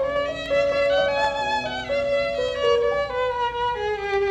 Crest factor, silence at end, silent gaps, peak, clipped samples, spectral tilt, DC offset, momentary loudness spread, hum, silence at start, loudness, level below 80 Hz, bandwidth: 14 dB; 0 s; none; -8 dBFS; under 0.1%; -4 dB/octave; under 0.1%; 5 LU; none; 0 s; -23 LUFS; -46 dBFS; 9 kHz